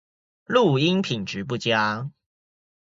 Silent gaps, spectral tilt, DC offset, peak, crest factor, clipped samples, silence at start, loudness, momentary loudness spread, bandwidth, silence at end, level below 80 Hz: none; -5.5 dB/octave; under 0.1%; -6 dBFS; 20 dB; under 0.1%; 0.5 s; -23 LUFS; 10 LU; 7.8 kHz; 0.8 s; -62 dBFS